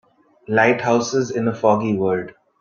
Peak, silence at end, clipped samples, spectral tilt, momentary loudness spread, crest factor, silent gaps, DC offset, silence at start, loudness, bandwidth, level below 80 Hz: -2 dBFS; 0.3 s; under 0.1%; -5.5 dB/octave; 6 LU; 18 dB; none; under 0.1%; 0.5 s; -19 LUFS; 7.4 kHz; -60 dBFS